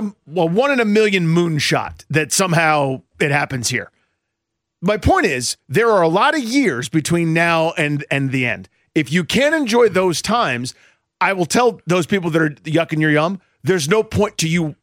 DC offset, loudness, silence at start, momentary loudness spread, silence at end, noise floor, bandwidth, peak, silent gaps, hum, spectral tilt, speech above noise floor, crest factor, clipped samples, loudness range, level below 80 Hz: under 0.1%; -17 LUFS; 0 s; 7 LU; 0.1 s; -78 dBFS; 16.5 kHz; -4 dBFS; none; none; -4.5 dB/octave; 61 dB; 14 dB; under 0.1%; 2 LU; -44 dBFS